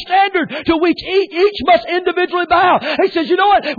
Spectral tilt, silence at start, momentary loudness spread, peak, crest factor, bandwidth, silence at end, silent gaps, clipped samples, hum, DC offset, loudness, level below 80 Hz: -6 dB/octave; 0 s; 5 LU; -4 dBFS; 10 dB; 4.9 kHz; 0.05 s; none; under 0.1%; none; under 0.1%; -14 LUFS; -46 dBFS